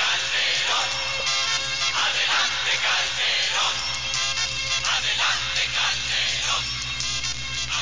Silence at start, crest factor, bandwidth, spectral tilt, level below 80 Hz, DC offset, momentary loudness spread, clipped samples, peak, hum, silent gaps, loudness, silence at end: 0 s; 16 dB; 7.8 kHz; 0.5 dB/octave; -46 dBFS; 0.9%; 4 LU; under 0.1%; -8 dBFS; 60 Hz at -45 dBFS; none; -21 LUFS; 0 s